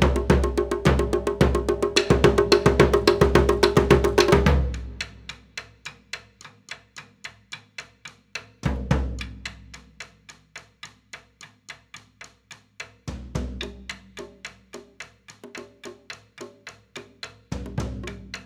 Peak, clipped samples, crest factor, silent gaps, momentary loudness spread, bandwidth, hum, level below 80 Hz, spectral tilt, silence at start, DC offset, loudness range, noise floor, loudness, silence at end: 0 dBFS; under 0.1%; 24 dB; none; 25 LU; 16.5 kHz; none; -32 dBFS; -5.5 dB/octave; 0 s; under 0.1%; 22 LU; -51 dBFS; -21 LUFS; 0.05 s